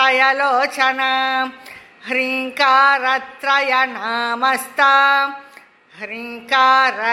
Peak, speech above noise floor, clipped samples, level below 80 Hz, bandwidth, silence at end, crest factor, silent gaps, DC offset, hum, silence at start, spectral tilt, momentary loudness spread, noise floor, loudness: 0 dBFS; 29 dB; under 0.1%; -72 dBFS; 16 kHz; 0 s; 16 dB; none; under 0.1%; none; 0 s; -1 dB/octave; 15 LU; -46 dBFS; -16 LUFS